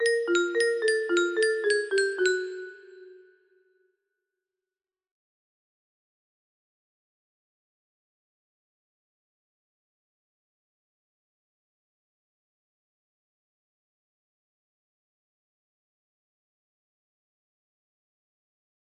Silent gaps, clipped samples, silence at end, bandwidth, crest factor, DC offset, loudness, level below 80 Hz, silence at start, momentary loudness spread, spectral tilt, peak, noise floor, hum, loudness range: none; under 0.1%; 15.85 s; 10.5 kHz; 22 dB; under 0.1%; -25 LUFS; -82 dBFS; 0 s; 9 LU; -1 dB/octave; -10 dBFS; under -90 dBFS; none; 11 LU